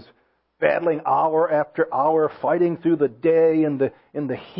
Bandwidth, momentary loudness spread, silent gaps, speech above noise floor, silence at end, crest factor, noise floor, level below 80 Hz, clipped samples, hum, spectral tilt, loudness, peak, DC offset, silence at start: 5.2 kHz; 7 LU; none; 43 dB; 0 s; 18 dB; -63 dBFS; -66 dBFS; under 0.1%; none; -12 dB/octave; -21 LUFS; -4 dBFS; under 0.1%; 0.6 s